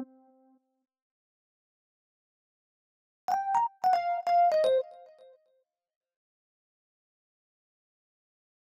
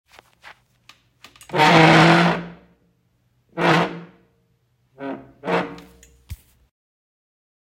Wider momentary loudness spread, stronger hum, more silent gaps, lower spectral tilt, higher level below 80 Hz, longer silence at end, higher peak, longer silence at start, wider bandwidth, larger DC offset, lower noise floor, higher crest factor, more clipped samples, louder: second, 17 LU vs 24 LU; neither; first, 1.02-3.28 s vs none; second, -3 dB/octave vs -5.5 dB/octave; second, -82 dBFS vs -54 dBFS; first, 3.7 s vs 1.35 s; second, -16 dBFS vs -2 dBFS; second, 0 s vs 1.5 s; about the same, 14.5 kHz vs 15 kHz; neither; first, -75 dBFS vs -65 dBFS; about the same, 18 dB vs 20 dB; neither; second, -27 LUFS vs -16 LUFS